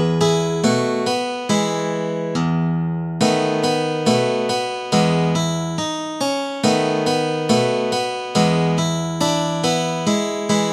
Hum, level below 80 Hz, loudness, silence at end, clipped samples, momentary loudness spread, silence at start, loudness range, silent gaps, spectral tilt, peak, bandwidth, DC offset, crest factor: none; -54 dBFS; -19 LUFS; 0 s; under 0.1%; 5 LU; 0 s; 1 LU; none; -5 dB/octave; -2 dBFS; 13 kHz; under 0.1%; 18 dB